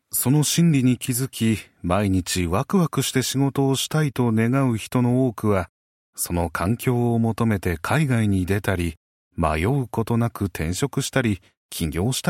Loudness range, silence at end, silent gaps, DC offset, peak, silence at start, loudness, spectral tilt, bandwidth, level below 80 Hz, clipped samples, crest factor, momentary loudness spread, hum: 3 LU; 0 s; 5.69-6.13 s, 8.97-9.31 s, 11.57-11.69 s; under 0.1%; -6 dBFS; 0.15 s; -22 LUFS; -5.5 dB/octave; 16.5 kHz; -42 dBFS; under 0.1%; 16 dB; 6 LU; none